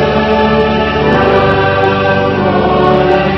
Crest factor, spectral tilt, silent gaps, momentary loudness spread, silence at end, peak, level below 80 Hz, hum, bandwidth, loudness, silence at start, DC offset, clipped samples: 10 dB; -7.5 dB/octave; none; 2 LU; 0 s; 0 dBFS; -28 dBFS; none; 6.2 kHz; -10 LUFS; 0 s; under 0.1%; 0.3%